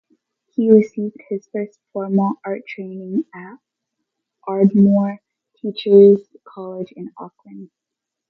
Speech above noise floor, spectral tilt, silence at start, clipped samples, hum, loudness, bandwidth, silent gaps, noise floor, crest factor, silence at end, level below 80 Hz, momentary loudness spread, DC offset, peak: 66 dB; -9.5 dB/octave; 0.6 s; under 0.1%; none; -17 LUFS; 4.9 kHz; none; -83 dBFS; 18 dB; 0.65 s; -66 dBFS; 22 LU; under 0.1%; 0 dBFS